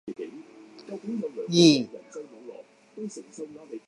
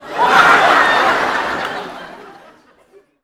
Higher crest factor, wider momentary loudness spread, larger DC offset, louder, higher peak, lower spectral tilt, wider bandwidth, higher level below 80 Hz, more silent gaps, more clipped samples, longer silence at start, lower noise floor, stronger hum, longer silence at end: first, 22 dB vs 16 dB; first, 26 LU vs 18 LU; neither; second, -23 LUFS vs -12 LUFS; second, -6 dBFS vs 0 dBFS; first, -5 dB/octave vs -2.5 dB/octave; second, 11.5 kHz vs 18 kHz; second, -78 dBFS vs -52 dBFS; neither; neither; about the same, 0.05 s vs 0 s; about the same, -48 dBFS vs -50 dBFS; neither; second, 0.1 s vs 0.9 s